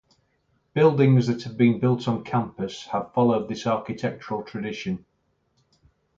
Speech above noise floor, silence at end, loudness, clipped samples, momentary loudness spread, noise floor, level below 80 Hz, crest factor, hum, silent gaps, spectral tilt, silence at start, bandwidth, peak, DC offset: 47 dB; 1.2 s; -24 LUFS; under 0.1%; 13 LU; -70 dBFS; -60 dBFS; 18 dB; none; none; -7.5 dB/octave; 0.75 s; 7.6 kHz; -6 dBFS; under 0.1%